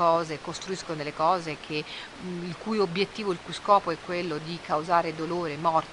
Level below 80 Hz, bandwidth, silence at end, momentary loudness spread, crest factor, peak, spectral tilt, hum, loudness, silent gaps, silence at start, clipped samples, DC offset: -60 dBFS; 11 kHz; 0 s; 11 LU; 20 dB; -6 dBFS; -5 dB/octave; none; -28 LUFS; none; 0 s; under 0.1%; under 0.1%